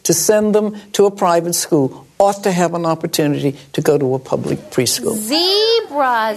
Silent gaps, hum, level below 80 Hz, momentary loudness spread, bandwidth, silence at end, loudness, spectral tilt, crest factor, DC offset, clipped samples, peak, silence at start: none; none; -56 dBFS; 7 LU; 13.5 kHz; 0 s; -16 LUFS; -4 dB/octave; 16 dB; under 0.1%; under 0.1%; 0 dBFS; 0.05 s